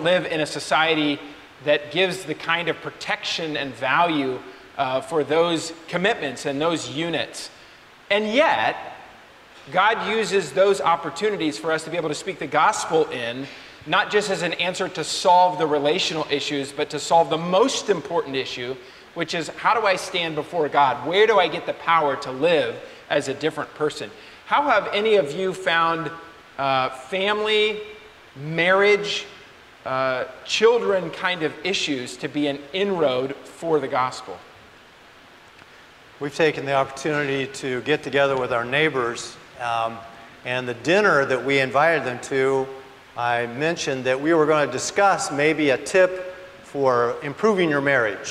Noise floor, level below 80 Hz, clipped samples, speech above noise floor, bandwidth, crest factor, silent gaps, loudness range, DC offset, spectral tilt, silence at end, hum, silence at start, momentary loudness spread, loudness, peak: -48 dBFS; -62 dBFS; under 0.1%; 27 dB; 14 kHz; 16 dB; none; 4 LU; under 0.1%; -4 dB/octave; 0 s; none; 0 s; 13 LU; -22 LUFS; -6 dBFS